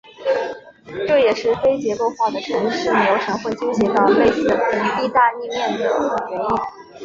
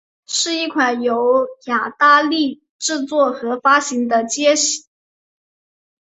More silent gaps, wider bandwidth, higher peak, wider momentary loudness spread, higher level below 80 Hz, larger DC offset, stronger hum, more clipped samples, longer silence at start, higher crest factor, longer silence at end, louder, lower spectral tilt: second, none vs 2.69-2.79 s; second, 7.6 kHz vs 8.4 kHz; about the same, -2 dBFS vs -2 dBFS; about the same, 8 LU vs 9 LU; first, -52 dBFS vs -68 dBFS; neither; neither; neither; second, 0.05 s vs 0.3 s; about the same, 16 dB vs 16 dB; second, 0 s vs 1.25 s; about the same, -19 LUFS vs -17 LUFS; first, -5 dB/octave vs -1 dB/octave